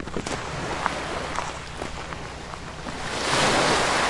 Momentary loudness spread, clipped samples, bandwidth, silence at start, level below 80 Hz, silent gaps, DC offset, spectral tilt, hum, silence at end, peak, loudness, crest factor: 15 LU; under 0.1%; 11.5 kHz; 0 s; -42 dBFS; none; under 0.1%; -3 dB/octave; none; 0 s; -2 dBFS; -26 LUFS; 24 dB